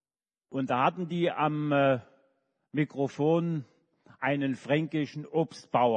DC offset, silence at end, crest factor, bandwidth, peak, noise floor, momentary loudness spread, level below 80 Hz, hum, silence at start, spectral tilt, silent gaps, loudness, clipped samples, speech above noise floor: under 0.1%; 0 s; 18 dB; 9.4 kHz; -12 dBFS; under -90 dBFS; 8 LU; -76 dBFS; none; 0.5 s; -7.5 dB/octave; none; -29 LUFS; under 0.1%; over 62 dB